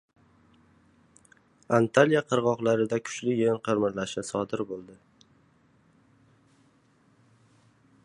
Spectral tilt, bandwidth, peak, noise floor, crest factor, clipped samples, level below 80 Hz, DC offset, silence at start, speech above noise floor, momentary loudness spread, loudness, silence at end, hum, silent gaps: -5.5 dB/octave; 11 kHz; -4 dBFS; -64 dBFS; 26 dB; under 0.1%; -68 dBFS; under 0.1%; 1.7 s; 38 dB; 11 LU; -26 LUFS; 3.1 s; none; none